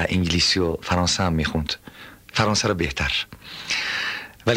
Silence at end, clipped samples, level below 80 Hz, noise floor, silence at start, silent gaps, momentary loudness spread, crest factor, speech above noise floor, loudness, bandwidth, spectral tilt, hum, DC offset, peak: 0 s; under 0.1%; -38 dBFS; -43 dBFS; 0 s; none; 13 LU; 18 dB; 21 dB; -22 LUFS; 16 kHz; -4 dB/octave; none; under 0.1%; -6 dBFS